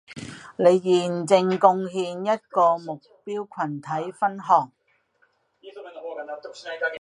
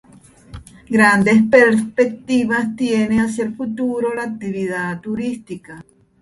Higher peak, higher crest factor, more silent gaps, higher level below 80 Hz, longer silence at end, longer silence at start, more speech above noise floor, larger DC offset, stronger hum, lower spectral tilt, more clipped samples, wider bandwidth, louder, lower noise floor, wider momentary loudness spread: about the same, -2 dBFS vs 0 dBFS; about the same, 22 dB vs 18 dB; neither; second, -70 dBFS vs -50 dBFS; second, 0 s vs 0.4 s; second, 0.1 s vs 0.55 s; first, 43 dB vs 28 dB; neither; neither; about the same, -5.5 dB/octave vs -6 dB/octave; neither; about the same, 11 kHz vs 11.5 kHz; second, -23 LUFS vs -17 LUFS; first, -66 dBFS vs -45 dBFS; first, 18 LU vs 13 LU